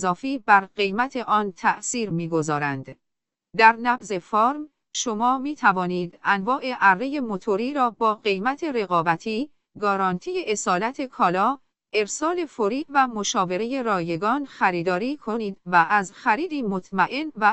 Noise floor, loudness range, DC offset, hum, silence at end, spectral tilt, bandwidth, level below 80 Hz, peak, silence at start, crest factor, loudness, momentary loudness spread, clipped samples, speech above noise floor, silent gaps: -79 dBFS; 2 LU; under 0.1%; none; 0 s; -4 dB/octave; 8.4 kHz; -62 dBFS; -2 dBFS; 0 s; 22 dB; -23 LUFS; 9 LU; under 0.1%; 56 dB; none